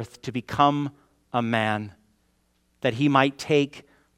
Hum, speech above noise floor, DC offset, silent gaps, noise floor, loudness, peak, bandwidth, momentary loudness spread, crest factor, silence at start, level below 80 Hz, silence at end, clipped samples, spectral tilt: none; 44 dB; under 0.1%; none; -68 dBFS; -24 LUFS; -2 dBFS; 13 kHz; 12 LU; 24 dB; 0 s; -62 dBFS; 0.4 s; under 0.1%; -6 dB/octave